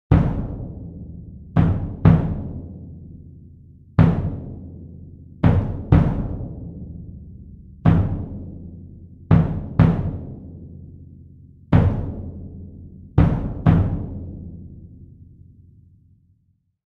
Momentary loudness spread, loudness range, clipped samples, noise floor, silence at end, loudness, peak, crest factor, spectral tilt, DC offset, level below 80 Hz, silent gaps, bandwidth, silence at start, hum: 23 LU; 4 LU; under 0.1%; -65 dBFS; 1.65 s; -20 LUFS; -2 dBFS; 20 dB; -11 dB/octave; under 0.1%; -32 dBFS; none; 4.5 kHz; 0.1 s; none